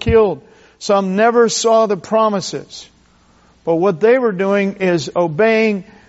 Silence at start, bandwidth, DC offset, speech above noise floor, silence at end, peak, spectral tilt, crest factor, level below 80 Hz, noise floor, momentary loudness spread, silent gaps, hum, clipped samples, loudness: 0 s; 8 kHz; under 0.1%; 37 dB; 0.25 s; -2 dBFS; -4.5 dB/octave; 14 dB; -40 dBFS; -51 dBFS; 15 LU; none; none; under 0.1%; -15 LUFS